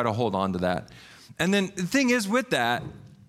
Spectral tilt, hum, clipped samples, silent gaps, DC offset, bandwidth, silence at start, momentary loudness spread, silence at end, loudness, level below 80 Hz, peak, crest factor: -4.5 dB/octave; none; under 0.1%; none; under 0.1%; 15.5 kHz; 0 s; 9 LU; 0.2 s; -25 LUFS; -58 dBFS; -10 dBFS; 16 dB